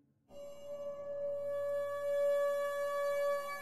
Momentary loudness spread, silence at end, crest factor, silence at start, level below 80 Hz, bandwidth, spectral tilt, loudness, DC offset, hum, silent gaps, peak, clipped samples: 14 LU; 0 s; 10 dB; 0 s; -78 dBFS; 15 kHz; -3 dB/octave; -36 LUFS; 0.2%; none; none; -26 dBFS; under 0.1%